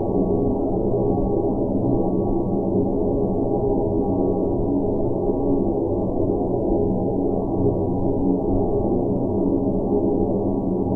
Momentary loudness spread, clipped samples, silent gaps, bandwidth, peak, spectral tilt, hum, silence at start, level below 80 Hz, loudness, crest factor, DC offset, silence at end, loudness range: 1 LU; under 0.1%; none; 1.4 kHz; -8 dBFS; -14 dB/octave; none; 0 s; -32 dBFS; -22 LUFS; 12 dB; 0.6%; 0 s; 0 LU